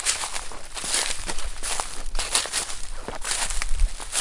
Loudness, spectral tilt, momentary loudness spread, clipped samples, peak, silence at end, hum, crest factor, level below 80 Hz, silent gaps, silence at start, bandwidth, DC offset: -27 LUFS; -0.5 dB/octave; 9 LU; under 0.1%; -2 dBFS; 0 s; none; 22 dB; -30 dBFS; none; 0 s; 11.5 kHz; under 0.1%